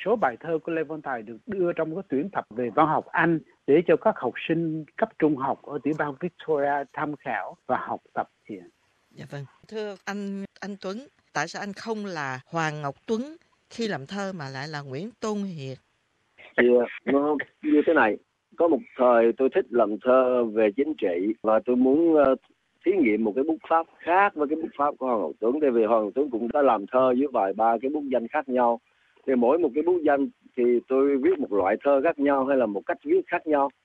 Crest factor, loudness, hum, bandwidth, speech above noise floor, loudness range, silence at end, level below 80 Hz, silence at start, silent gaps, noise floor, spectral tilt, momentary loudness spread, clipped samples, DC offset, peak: 20 dB; -25 LUFS; none; 8.4 kHz; 46 dB; 11 LU; 0.15 s; -66 dBFS; 0 s; none; -70 dBFS; -6.5 dB/octave; 13 LU; under 0.1%; under 0.1%; -4 dBFS